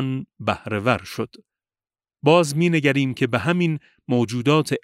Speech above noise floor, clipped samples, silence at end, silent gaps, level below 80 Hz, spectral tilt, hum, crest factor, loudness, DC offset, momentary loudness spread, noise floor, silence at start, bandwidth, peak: over 69 dB; under 0.1%; 0.05 s; none; -58 dBFS; -6 dB/octave; none; 20 dB; -21 LUFS; under 0.1%; 11 LU; under -90 dBFS; 0 s; 15.5 kHz; -2 dBFS